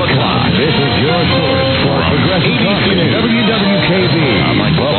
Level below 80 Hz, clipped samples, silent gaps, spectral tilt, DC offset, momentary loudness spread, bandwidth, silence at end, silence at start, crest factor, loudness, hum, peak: -34 dBFS; under 0.1%; none; -10.5 dB/octave; under 0.1%; 1 LU; 4.6 kHz; 0 s; 0 s; 10 dB; -12 LUFS; none; -2 dBFS